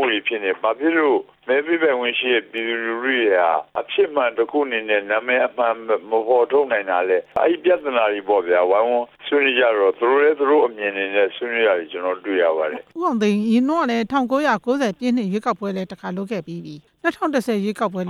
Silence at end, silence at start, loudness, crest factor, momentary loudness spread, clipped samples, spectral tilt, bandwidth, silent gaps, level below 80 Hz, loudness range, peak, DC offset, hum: 0 s; 0 s; -20 LUFS; 14 dB; 8 LU; under 0.1%; -5.5 dB/octave; 13 kHz; none; -68 dBFS; 3 LU; -4 dBFS; under 0.1%; none